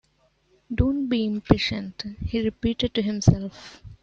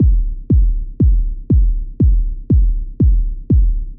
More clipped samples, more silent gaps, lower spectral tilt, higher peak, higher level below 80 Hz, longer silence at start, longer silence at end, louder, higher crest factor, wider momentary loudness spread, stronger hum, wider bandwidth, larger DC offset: neither; neither; second, -6.5 dB/octave vs -15.5 dB/octave; about the same, -4 dBFS vs -4 dBFS; second, -38 dBFS vs -14 dBFS; first, 0.7 s vs 0 s; about the same, 0.05 s vs 0 s; second, -25 LUFS vs -17 LUFS; first, 22 dB vs 8 dB; first, 13 LU vs 5 LU; neither; first, 7.8 kHz vs 0.7 kHz; second, under 0.1% vs 0.1%